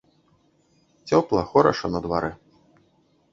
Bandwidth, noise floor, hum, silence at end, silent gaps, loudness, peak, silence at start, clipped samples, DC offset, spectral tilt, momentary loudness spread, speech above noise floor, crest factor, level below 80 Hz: 7.6 kHz; -63 dBFS; none; 1 s; none; -22 LUFS; -2 dBFS; 1.05 s; under 0.1%; under 0.1%; -6.5 dB/octave; 11 LU; 42 dB; 22 dB; -50 dBFS